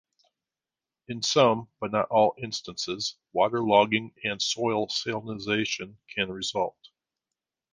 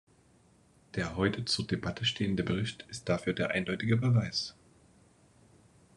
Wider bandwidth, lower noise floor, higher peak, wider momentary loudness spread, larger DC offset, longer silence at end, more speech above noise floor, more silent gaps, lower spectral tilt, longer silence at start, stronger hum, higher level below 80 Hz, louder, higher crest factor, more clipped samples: about the same, 10 kHz vs 11 kHz; first, under -90 dBFS vs -64 dBFS; first, -6 dBFS vs -14 dBFS; about the same, 11 LU vs 9 LU; neither; second, 1.05 s vs 1.45 s; first, over 63 dB vs 33 dB; neither; second, -3.5 dB/octave vs -5.5 dB/octave; first, 1.1 s vs 0.95 s; neither; second, -66 dBFS vs -60 dBFS; first, -27 LUFS vs -32 LUFS; about the same, 22 dB vs 18 dB; neither